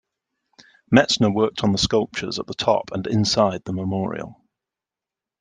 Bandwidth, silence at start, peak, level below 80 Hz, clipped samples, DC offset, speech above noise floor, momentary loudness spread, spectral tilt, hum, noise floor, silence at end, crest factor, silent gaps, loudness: 10 kHz; 0.9 s; -2 dBFS; -50 dBFS; under 0.1%; under 0.1%; 68 dB; 10 LU; -5 dB/octave; none; -88 dBFS; 1.05 s; 20 dB; none; -21 LUFS